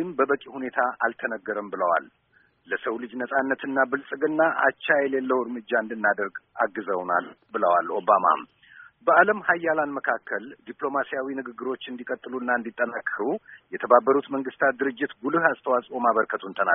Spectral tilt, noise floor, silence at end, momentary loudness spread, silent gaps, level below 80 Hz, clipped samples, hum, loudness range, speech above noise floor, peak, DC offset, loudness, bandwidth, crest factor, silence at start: 2 dB/octave; -51 dBFS; 0 s; 12 LU; none; -74 dBFS; under 0.1%; none; 5 LU; 26 dB; -2 dBFS; under 0.1%; -25 LUFS; 3.8 kHz; 22 dB; 0 s